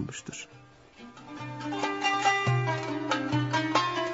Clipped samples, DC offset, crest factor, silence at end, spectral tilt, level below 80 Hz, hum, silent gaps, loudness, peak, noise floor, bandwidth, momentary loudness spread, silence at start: under 0.1%; under 0.1%; 18 dB; 0 s; -4.5 dB/octave; -64 dBFS; none; none; -28 LUFS; -12 dBFS; -51 dBFS; 8 kHz; 19 LU; 0 s